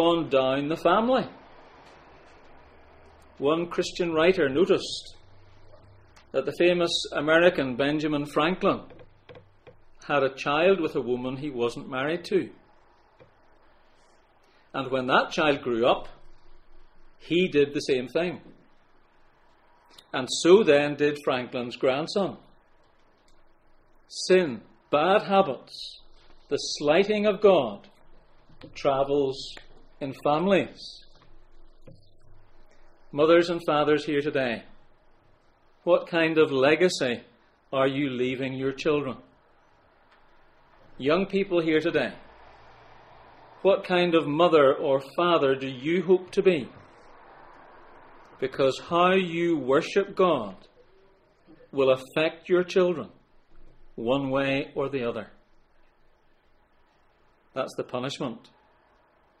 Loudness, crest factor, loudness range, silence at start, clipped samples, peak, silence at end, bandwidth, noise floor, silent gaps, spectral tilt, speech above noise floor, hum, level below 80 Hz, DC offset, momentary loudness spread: -25 LUFS; 22 dB; 7 LU; 0 s; under 0.1%; -6 dBFS; 1 s; 11.5 kHz; -62 dBFS; none; -5 dB/octave; 38 dB; none; -56 dBFS; under 0.1%; 13 LU